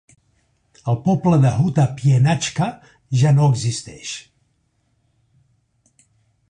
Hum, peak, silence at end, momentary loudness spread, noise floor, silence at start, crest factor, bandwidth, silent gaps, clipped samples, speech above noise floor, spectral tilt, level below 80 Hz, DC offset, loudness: none; -6 dBFS; 2.3 s; 15 LU; -66 dBFS; 0.85 s; 14 dB; 10 kHz; none; under 0.1%; 49 dB; -6.5 dB/octave; -50 dBFS; under 0.1%; -18 LUFS